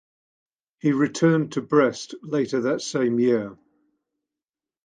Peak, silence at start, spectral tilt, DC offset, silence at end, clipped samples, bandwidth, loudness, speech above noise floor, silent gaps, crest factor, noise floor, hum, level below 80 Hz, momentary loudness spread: -4 dBFS; 0.85 s; -6 dB/octave; under 0.1%; 1.3 s; under 0.1%; 9.6 kHz; -23 LUFS; over 68 dB; none; 20 dB; under -90 dBFS; none; -68 dBFS; 7 LU